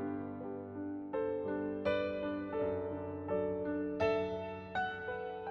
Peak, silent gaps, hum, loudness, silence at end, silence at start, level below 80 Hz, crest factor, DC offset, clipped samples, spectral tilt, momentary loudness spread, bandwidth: -20 dBFS; none; none; -38 LUFS; 0 s; 0 s; -66 dBFS; 18 dB; under 0.1%; under 0.1%; -5 dB/octave; 8 LU; 6.6 kHz